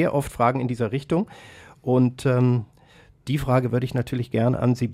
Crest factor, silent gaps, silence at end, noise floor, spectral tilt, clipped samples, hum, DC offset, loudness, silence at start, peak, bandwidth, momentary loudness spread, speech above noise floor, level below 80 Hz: 16 dB; none; 0 s; -53 dBFS; -8 dB/octave; under 0.1%; none; under 0.1%; -23 LUFS; 0 s; -6 dBFS; 15 kHz; 7 LU; 31 dB; -48 dBFS